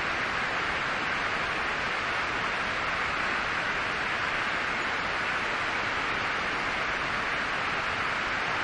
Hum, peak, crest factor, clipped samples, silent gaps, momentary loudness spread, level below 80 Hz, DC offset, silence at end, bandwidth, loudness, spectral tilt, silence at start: none; -16 dBFS; 14 dB; under 0.1%; none; 1 LU; -52 dBFS; under 0.1%; 0 s; 11.5 kHz; -28 LUFS; -3 dB/octave; 0 s